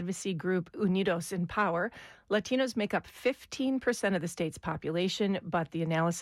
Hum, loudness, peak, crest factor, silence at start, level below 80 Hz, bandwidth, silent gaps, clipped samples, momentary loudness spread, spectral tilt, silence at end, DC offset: none; -32 LUFS; -16 dBFS; 14 dB; 0 s; -62 dBFS; 14.5 kHz; none; under 0.1%; 5 LU; -5.5 dB/octave; 0 s; under 0.1%